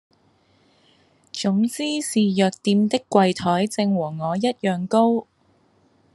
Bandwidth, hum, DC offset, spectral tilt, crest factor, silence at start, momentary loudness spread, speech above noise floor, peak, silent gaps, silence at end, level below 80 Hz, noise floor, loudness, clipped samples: 12.5 kHz; none; under 0.1%; -5.5 dB/octave; 20 dB; 1.35 s; 6 LU; 40 dB; -2 dBFS; none; 0.95 s; -68 dBFS; -61 dBFS; -21 LUFS; under 0.1%